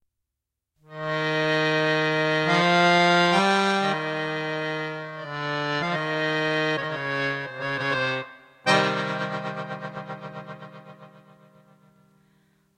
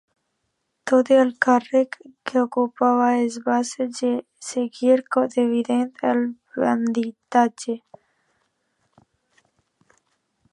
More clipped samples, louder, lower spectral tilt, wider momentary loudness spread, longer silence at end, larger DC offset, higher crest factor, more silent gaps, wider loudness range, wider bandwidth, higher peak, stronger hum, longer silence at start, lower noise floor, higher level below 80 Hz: neither; second, -24 LUFS vs -21 LUFS; about the same, -5 dB/octave vs -4.5 dB/octave; first, 17 LU vs 10 LU; second, 1.7 s vs 2.75 s; neither; about the same, 20 dB vs 20 dB; neither; about the same, 9 LU vs 7 LU; first, 12.5 kHz vs 11 kHz; second, -6 dBFS vs -2 dBFS; neither; about the same, 0.9 s vs 0.85 s; first, -85 dBFS vs -75 dBFS; about the same, -72 dBFS vs -76 dBFS